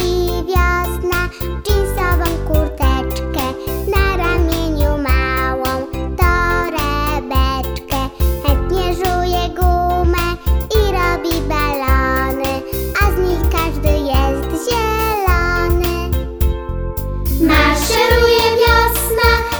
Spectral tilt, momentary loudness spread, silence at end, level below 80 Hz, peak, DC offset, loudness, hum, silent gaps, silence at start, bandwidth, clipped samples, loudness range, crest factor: -5 dB/octave; 8 LU; 0 s; -20 dBFS; 0 dBFS; under 0.1%; -16 LUFS; none; none; 0 s; over 20 kHz; under 0.1%; 3 LU; 14 dB